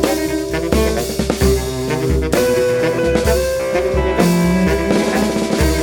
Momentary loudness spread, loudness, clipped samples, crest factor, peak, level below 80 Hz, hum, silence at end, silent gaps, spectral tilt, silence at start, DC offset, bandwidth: 5 LU; -16 LUFS; under 0.1%; 14 dB; -2 dBFS; -24 dBFS; none; 0 s; none; -5.5 dB/octave; 0 s; under 0.1%; 19 kHz